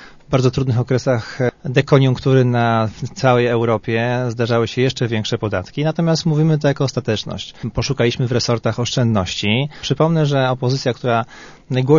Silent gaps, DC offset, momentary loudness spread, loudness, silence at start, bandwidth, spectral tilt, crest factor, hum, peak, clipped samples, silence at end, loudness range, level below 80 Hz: none; under 0.1%; 7 LU; -18 LUFS; 0 s; 7.4 kHz; -6 dB/octave; 16 dB; none; 0 dBFS; under 0.1%; 0 s; 2 LU; -46 dBFS